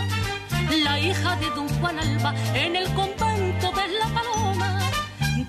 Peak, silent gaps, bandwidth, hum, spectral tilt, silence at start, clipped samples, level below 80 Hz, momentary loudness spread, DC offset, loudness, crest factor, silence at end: -10 dBFS; none; 14.5 kHz; none; -4.5 dB/octave; 0 s; under 0.1%; -40 dBFS; 4 LU; under 0.1%; -24 LUFS; 14 dB; 0 s